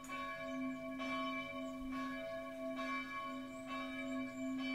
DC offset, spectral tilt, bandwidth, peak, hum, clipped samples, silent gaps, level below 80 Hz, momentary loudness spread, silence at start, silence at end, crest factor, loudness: under 0.1%; -4 dB/octave; 16 kHz; -30 dBFS; none; under 0.1%; none; -68 dBFS; 4 LU; 0 s; 0 s; 14 dB; -43 LUFS